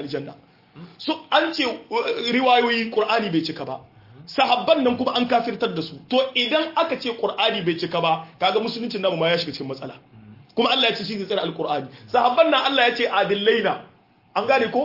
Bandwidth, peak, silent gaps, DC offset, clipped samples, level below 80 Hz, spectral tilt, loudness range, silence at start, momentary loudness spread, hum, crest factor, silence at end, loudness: 5.8 kHz; -4 dBFS; none; under 0.1%; under 0.1%; -66 dBFS; -5 dB/octave; 3 LU; 0 s; 13 LU; none; 18 dB; 0 s; -21 LUFS